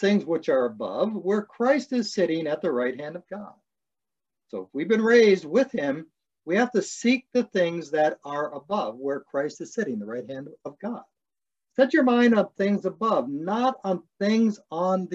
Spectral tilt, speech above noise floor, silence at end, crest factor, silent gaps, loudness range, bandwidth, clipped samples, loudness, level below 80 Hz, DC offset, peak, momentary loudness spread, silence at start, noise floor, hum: -5.5 dB/octave; over 66 dB; 0 s; 20 dB; none; 6 LU; 8.2 kHz; under 0.1%; -25 LUFS; -76 dBFS; under 0.1%; -6 dBFS; 16 LU; 0 s; under -90 dBFS; none